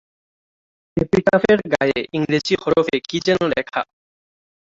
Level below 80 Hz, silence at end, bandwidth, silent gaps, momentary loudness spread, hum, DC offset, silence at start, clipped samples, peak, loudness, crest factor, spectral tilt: -50 dBFS; 0.85 s; 7.8 kHz; none; 10 LU; none; under 0.1%; 0.95 s; under 0.1%; -2 dBFS; -19 LUFS; 18 dB; -5.5 dB/octave